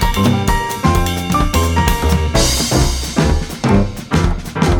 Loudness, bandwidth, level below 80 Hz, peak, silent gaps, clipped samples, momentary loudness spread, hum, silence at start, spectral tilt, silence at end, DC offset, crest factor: -15 LUFS; 20 kHz; -20 dBFS; 0 dBFS; none; under 0.1%; 3 LU; none; 0 s; -5 dB/octave; 0 s; under 0.1%; 14 dB